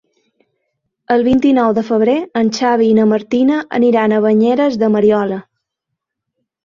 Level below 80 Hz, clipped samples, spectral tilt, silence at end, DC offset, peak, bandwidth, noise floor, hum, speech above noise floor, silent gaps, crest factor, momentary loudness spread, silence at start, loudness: -52 dBFS; under 0.1%; -6.5 dB/octave; 1.25 s; under 0.1%; -2 dBFS; 7.2 kHz; -78 dBFS; none; 65 dB; none; 12 dB; 5 LU; 1.1 s; -13 LUFS